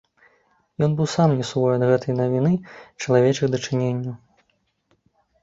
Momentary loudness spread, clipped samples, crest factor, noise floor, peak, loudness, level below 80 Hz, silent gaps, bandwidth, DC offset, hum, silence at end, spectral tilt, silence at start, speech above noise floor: 14 LU; under 0.1%; 18 dB; -69 dBFS; -4 dBFS; -21 LUFS; -58 dBFS; none; 7.8 kHz; under 0.1%; none; 1.25 s; -7 dB/octave; 0.8 s; 48 dB